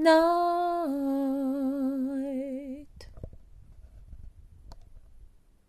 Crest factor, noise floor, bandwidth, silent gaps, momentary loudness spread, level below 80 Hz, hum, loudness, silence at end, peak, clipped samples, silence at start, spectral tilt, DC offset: 20 dB; -54 dBFS; 14 kHz; none; 24 LU; -52 dBFS; none; -28 LUFS; 0.4 s; -10 dBFS; under 0.1%; 0 s; -5.5 dB/octave; under 0.1%